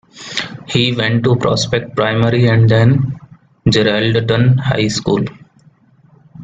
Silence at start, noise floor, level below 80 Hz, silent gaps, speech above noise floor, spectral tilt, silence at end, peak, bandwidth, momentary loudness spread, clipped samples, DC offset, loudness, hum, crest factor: 0.15 s; -49 dBFS; -44 dBFS; none; 36 dB; -6 dB/octave; 0 s; 0 dBFS; 7.8 kHz; 11 LU; under 0.1%; under 0.1%; -14 LUFS; none; 14 dB